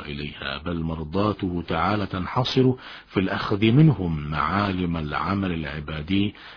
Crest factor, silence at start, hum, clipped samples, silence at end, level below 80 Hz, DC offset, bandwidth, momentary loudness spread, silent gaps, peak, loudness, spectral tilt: 18 dB; 0 s; none; under 0.1%; 0 s; -42 dBFS; under 0.1%; 5.4 kHz; 11 LU; none; -6 dBFS; -24 LUFS; -8 dB/octave